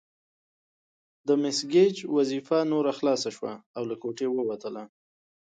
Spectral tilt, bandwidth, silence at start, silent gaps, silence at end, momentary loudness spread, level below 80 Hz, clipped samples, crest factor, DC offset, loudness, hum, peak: -5 dB/octave; 9.2 kHz; 1.25 s; 3.66-3.74 s; 0.65 s; 14 LU; -78 dBFS; under 0.1%; 18 dB; under 0.1%; -27 LUFS; none; -10 dBFS